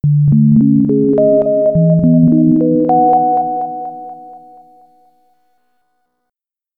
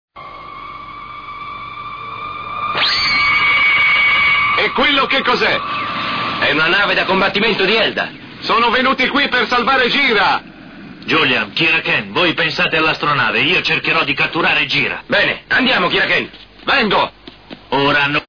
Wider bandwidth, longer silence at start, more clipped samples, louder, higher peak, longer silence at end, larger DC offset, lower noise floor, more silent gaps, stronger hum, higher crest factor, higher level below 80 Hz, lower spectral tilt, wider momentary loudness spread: second, 1.8 kHz vs 5.4 kHz; about the same, 0.05 s vs 0.15 s; neither; about the same, -11 LUFS vs -13 LUFS; first, 0 dBFS vs -4 dBFS; first, 2.4 s vs 0.05 s; second, under 0.1% vs 0.2%; first, -80 dBFS vs -37 dBFS; neither; neither; about the same, 12 dB vs 12 dB; about the same, -44 dBFS vs -46 dBFS; first, -14.5 dB/octave vs -4.5 dB/octave; second, 13 LU vs 17 LU